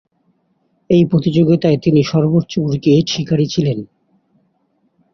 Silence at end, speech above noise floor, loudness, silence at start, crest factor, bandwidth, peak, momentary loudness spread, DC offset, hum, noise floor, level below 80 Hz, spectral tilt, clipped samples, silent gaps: 1.3 s; 49 dB; -15 LUFS; 0.9 s; 16 dB; 6.8 kHz; 0 dBFS; 5 LU; under 0.1%; none; -63 dBFS; -50 dBFS; -7.5 dB/octave; under 0.1%; none